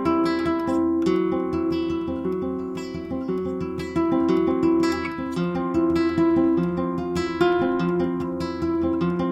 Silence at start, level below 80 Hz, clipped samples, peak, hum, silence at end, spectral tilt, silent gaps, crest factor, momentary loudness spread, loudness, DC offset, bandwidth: 0 s; -50 dBFS; under 0.1%; -8 dBFS; none; 0 s; -7.5 dB/octave; none; 14 dB; 7 LU; -23 LUFS; under 0.1%; 8.6 kHz